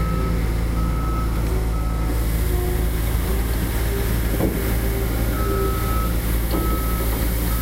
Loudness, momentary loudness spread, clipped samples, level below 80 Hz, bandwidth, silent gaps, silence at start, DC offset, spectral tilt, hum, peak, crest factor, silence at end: -23 LUFS; 2 LU; under 0.1%; -22 dBFS; 16 kHz; none; 0 s; 0.5%; -6 dB/octave; none; -8 dBFS; 12 dB; 0 s